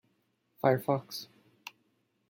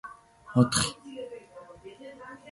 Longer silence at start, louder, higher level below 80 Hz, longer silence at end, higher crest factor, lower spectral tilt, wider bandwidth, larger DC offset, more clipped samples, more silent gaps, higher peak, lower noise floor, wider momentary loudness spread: first, 0.65 s vs 0.05 s; second, -31 LUFS vs -26 LUFS; second, -76 dBFS vs -56 dBFS; first, 1.05 s vs 0 s; about the same, 24 dB vs 22 dB; first, -6 dB/octave vs -4.5 dB/octave; first, 17 kHz vs 11.5 kHz; neither; neither; neither; second, -12 dBFS vs -8 dBFS; first, -75 dBFS vs -48 dBFS; about the same, 21 LU vs 23 LU